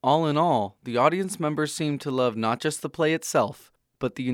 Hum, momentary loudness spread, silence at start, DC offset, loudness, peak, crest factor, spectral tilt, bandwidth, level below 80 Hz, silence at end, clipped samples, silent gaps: none; 7 LU; 0.05 s; under 0.1%; -25 LUFS; -6 dBFS; 18 dB; -5 dB/octave; 17.5 kHz; -64 dBFS; 0 s; under 0.1%; none